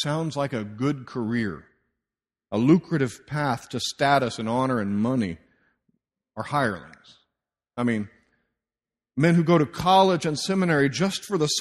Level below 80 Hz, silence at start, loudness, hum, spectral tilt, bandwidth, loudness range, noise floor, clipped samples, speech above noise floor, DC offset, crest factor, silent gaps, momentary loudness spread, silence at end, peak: -58 dBFS; 0 s; -24 LUFS; none; -5.5 dB/octave; 13.5 kHz; 9 LU; under -90 dBFS; under 0.1%; over 67 dB; under 0.1%; 20 dB; none; 12 LU; 0 s; -6 dBFS